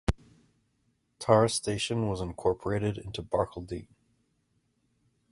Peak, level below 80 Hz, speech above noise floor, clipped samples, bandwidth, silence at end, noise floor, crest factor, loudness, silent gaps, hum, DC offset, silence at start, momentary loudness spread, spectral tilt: -6 dBFS; -46 dBFS; 45 dB; under 0.1%; 11.5 kHz; 1.5 s; -74 dBFS; 26 dB; -29 LUFS; none; none; under 0.1%; 0.1 s; 16 LU; -5 dB/octave